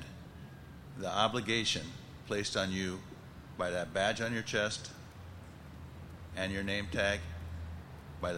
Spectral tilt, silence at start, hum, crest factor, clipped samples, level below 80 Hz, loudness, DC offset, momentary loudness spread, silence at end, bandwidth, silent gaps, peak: -4 dB/octave; 0 s; none; 22 dB; under 0.1%; -54 dBFS; -35 LUFS; under 0.1%; 19 LU; 0 s; 16 kHz; none; -14 dBFS